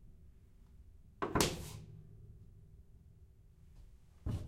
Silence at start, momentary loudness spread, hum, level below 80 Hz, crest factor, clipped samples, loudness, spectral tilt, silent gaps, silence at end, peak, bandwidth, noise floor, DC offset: 0 s; 29 LU; none; -54 dBFS; 34 dB; under 0.1%; -38 LUFS; -4 dB/octave; none; 0 s; -10 dBFS; 16 kHz; -61 dBFS; under 0.1%